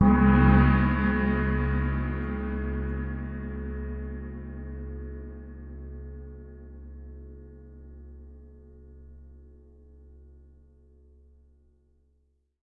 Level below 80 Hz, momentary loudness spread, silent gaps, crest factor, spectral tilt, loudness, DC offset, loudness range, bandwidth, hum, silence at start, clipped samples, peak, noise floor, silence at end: -34 dBFS; 28 LU; none; 22 dB; -11.5 dB/octave; -26 LUFS; under 0.1%; 25 LU; 4.4 kHz; none; 0 s; under 0.1%; -8 dBFS; -70 dBFS; 3.15 s